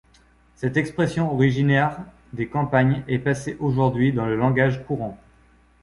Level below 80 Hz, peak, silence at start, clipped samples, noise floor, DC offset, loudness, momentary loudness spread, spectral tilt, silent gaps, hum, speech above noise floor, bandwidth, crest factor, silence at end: -50 dBFS; -4 dBFS; 0.6 s; under 0.1%; -56 dBFS; under 0.1%; -22 LUFS; 10 LU; -7.5 dB/octave; none; none; 35 dB; 11.5 kHz; 18 dB; 0.65 s